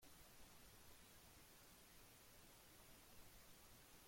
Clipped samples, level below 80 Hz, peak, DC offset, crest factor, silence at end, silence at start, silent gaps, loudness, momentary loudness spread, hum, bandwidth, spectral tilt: under 0.1%; -74 dBFS; -50 dBFS; under 0.1%; 14 dB; 0 s; 0 s; none; -65 LUFS; 0 LU; none; 16.5 kHz; -2.5 dB/octave